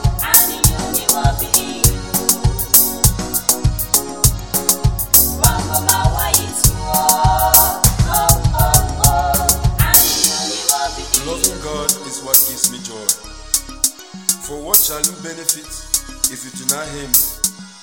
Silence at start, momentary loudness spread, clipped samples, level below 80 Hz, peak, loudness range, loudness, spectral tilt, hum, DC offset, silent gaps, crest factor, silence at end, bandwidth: 0 s; 10 LU; 0.1%; -26 dBFS; 0 dBFS; 4 LU; -14 LUFS; -2.5 dB/octave; none; 0.4%; none; 16 dB; 0 s; over 20 kHz